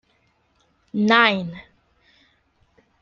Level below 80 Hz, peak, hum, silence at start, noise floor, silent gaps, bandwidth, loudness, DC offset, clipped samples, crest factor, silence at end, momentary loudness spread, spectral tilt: -64 dBFS; -2 dBFS; none; 0.95 s; -65 dBFS; none; 7 kHz; -18 LUFS; under 0.1%; under 0.1%; 22 dB; 1.4 s; 20 LU; -5.5 dB/octave